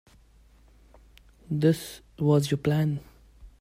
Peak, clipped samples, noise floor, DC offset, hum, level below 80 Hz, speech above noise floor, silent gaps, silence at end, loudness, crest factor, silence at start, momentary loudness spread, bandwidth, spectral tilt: -10 dBFS; under 0.1%; -57 dBFS; under 0.1%; none; -54 dBFS; 32 dB; none; 0.1 s; -26 LUFS; 18 dB; 1.5 s; 11 LU; 16 kHz; -7 dB/octave